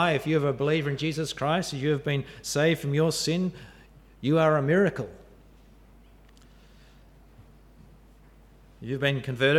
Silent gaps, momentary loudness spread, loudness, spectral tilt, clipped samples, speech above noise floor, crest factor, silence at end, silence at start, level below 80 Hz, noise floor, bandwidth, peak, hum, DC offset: none; 11 LU; -26 LUFS; -5.5 dB/octave; under 0.1%; 29 dB; 18 dB; 0 s; 0 s; -56 dBFS; -54 dBFS; 15 kHz; -10 dBFS; none; under 0.1%